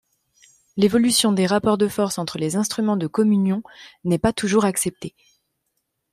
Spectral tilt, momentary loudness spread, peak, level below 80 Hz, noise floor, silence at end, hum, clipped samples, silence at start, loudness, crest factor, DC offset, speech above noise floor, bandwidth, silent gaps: -4.5 dB/octave; 10 LU; -6 dBFS; -52 dBFS; -75 dBFS; 1.05 s; none; under 0.1%; 0.75 s; -20 LUFS; 16 dB; under 0.1%; 55 dB; 15.5 kHz; none